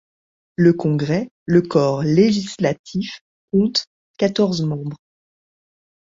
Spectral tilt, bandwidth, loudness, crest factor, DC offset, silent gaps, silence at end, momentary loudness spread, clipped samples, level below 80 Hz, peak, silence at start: -6.5 dB/octave; 7.8 kHz; -19 LUFS; 18 dB; under 0.1%; 1.31-1.46 s, 2.79-2.84 s, 3.21-3.48 s, 3.87-4.14 s; 1.15 s; 13 LU; under 0.1%; -56 dBFS; -2 dBFS; 0.6 s